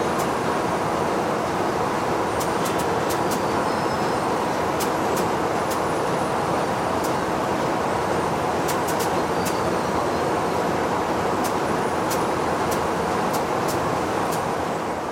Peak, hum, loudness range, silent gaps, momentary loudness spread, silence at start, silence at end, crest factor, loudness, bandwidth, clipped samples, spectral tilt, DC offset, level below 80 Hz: -10 dBFS; none; 0 LU; none; 1 LU; 0 s; 0 s; 14 dB; -23 LUFS; 16.5 kHz; under 0.1%; -4.5 dB/octave; under 0.1%; -50 dBFS